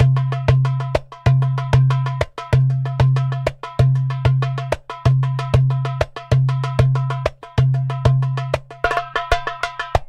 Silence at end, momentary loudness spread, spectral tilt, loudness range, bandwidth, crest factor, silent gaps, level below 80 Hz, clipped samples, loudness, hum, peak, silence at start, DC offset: 0.05 s; 7 LU; -7.5 dB/octave; 1 LU; 7.8 kHz; 18 dB; none; -34 dBFS; under 0.1%; -19 LUFS; none; 0 dBFS; 0 s; under 0.1%